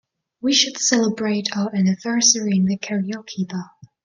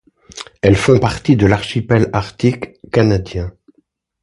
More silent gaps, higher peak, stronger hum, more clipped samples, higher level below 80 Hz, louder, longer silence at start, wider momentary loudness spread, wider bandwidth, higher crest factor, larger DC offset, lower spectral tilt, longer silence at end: neither; about the same, -2 dBFS vs 0 dBFS; neither; neither; second, -64 dBFS vs -34 dBFS; second, -19 LUFS vs -15 LUFS; about the same, 0.45 s vs 0.35 s; second, 12 LU vs 16 LU; about the same, 10.5 kHz vs 11.5 kHz; about the same, 18 dB vs 16 dB; neither; second, -3 dB/octave vs -7 dB/octave; second, 0.4 s vs 0.75 s